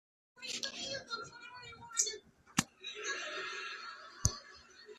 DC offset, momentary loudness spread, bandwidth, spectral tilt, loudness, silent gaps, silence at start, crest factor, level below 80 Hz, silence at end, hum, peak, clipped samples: under 0.1%; 15 LU; 13.5 kHz; -2 dB/octave; -39 LUFS; none; 0.35 s; 32 dB; -58 dBFS; 0 s; none; -10 dBFS; under 0.1%